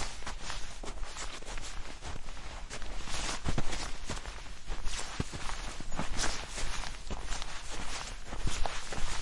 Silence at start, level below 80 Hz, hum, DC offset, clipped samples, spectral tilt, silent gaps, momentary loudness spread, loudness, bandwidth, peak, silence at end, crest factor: 0 s; -40 dBFS; none; under 0.1%; under 0.1%; -3 dB/octave; none; 9 LU; -40 LUFS; 11.5 kHz; -16 dBFS; 0 s; 16 dB